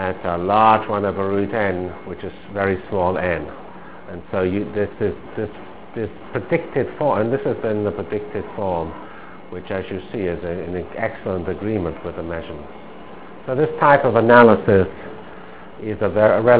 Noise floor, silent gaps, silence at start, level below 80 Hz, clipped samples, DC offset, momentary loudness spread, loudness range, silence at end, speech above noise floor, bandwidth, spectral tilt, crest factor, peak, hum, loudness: -39 dBFS; none; 0 s; -44 dBFS; under 0.1%; 1%; 21 LU; 10 LU; 0 s; 19 dB; 4 kHz; -10.5 dB/octave; 20 dB; 0 dBFS; none; -20 LUFS